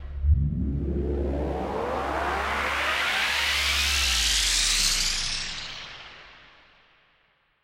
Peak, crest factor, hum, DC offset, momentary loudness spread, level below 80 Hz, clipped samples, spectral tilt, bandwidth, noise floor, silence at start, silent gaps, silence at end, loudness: -10 dBFS; 16 dB; none; under 0.1%; 12 LU; -34 dBFS; under 0.1%; -2.5 dB/octave; 16 kHz; -66 dBFS; 0 s; none; 1.25 s; -24 LUFS